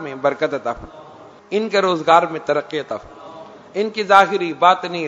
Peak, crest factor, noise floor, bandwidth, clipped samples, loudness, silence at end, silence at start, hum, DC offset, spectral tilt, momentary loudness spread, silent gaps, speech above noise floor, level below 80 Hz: 0 dBFS; 18 dB; -38 dBFS; 11 kHz; under 0.1%; -17 LUFS; 0 s; 0 s; none; under 0.1%; -4.5 dB/octave; 17 LU; none; 21 dB; -54 dBFS